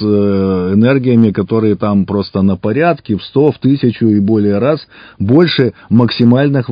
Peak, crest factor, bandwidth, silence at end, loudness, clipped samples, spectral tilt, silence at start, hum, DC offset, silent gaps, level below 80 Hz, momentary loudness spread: 0 dBFS; 12 dB; 5.2 kHz; 0 s; -12 LUFS; 0.4%; -10.5 dB/octave; 0 s; none; under 0.1%; none; -40 dBFS; 5 LU